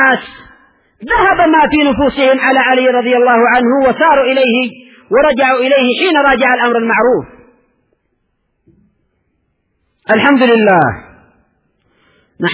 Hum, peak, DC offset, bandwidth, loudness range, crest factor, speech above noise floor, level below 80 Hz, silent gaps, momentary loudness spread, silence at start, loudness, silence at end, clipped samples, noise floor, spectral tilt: none; 0 dBFS; under 0.1%; 4 kHz; 7 LU; 12 dB; 55 dB; -42 dBFS; none; 7 LU; 0 s; -10 LUFS; 0 s; under 0.1%; -64 dBFS; -8.5 dB/octave